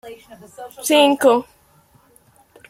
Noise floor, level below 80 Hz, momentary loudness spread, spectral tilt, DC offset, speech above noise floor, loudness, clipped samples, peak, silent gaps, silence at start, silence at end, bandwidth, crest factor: -54 dBFS; -64 dBFS; 24 LU; -2 dB/octave; under 0.1%; 37 dB; -16 LUFS; under 0.1%; -2 dBFS; none; 0.05 s; 1.3 s; 16.5 kHz; 18 dB